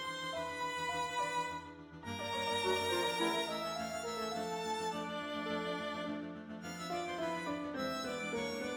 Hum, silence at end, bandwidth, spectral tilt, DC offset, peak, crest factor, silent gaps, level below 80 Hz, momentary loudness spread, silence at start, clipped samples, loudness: none; 0 s; over 20 kHz; -3.5 dB/octave; under 0.1%; -22 dBFS; 18 dB; none; -70 dBFS; 10 LU; 0 s; under 0.1%; -38 LUFS